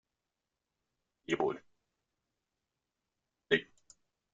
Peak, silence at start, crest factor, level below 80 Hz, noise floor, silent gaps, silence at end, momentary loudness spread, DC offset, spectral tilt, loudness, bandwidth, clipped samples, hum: -14 dBFS; 1.3 s; 28 dB; -80 dBFS; -89 dBFS; none; 0.7 s; 14 LU; under 0.1%; -2.5 dB/octave; -34 LUFS; 7.6 kHz; under 0.1%; none